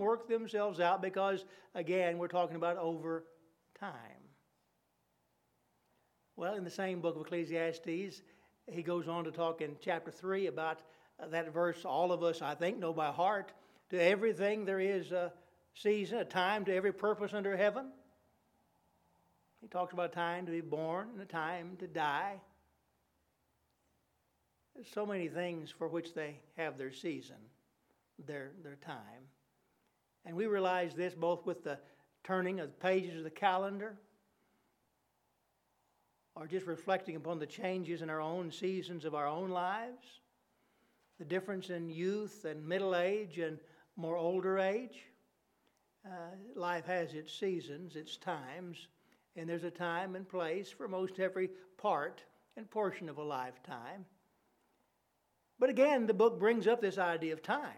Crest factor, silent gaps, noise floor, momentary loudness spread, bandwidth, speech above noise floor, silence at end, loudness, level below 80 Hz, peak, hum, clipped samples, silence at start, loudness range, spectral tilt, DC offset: 22 dB; none; -79 dBFS; 15 LU; 14.5 kHz; 42 dB; 0 s; -37 LUFS; -88 dBFS; -16 dBFS; none; under 0.1%; 0 s; 9 LU; -6 dB/octave; under 0.1%